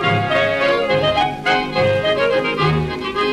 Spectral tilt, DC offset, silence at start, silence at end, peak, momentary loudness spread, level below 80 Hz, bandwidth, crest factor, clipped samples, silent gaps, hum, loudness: -6 dB/octave; under 0.1%; 0 s; 0 s; -4 dBFS; 2 LU; -40 dBFS; 12.5 kHz; 14 dB; under 0.1%; none; none; -17 LUFS